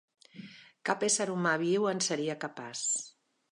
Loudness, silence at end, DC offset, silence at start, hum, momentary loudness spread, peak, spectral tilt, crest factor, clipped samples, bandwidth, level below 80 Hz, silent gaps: -31 LUFS; 0.4 s; under 0.1%; 0.35 s; none; 21 LU; -12 dBFS; -3 dB/octave; 20 dB; under 0.1%; 11.5 kHz; -82 dBFS; none